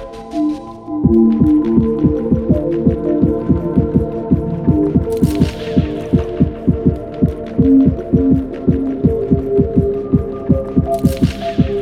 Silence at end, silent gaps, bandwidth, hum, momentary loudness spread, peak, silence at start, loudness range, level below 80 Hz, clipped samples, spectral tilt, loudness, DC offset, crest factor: 0 s; none; 15 kHz; none; 6 LU; 0 dBFS; 0 s; 2 LU; -28 dBFS; under 0.1%; -9.5 dB/octave; -15 LUFS; under 0.1%; 14 dB